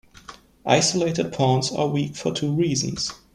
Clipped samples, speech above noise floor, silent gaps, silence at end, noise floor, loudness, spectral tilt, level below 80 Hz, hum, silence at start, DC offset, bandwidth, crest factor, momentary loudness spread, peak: under 0.1%; 23 dB; none; 0.2 s; -46 dBFS; -22 LUFS; -4.5 dB/octave; -54 dBFS; none; 0.3 s; under 0.1%; 12.5 kHz; 20 dB; 7 LU; -2 dBFS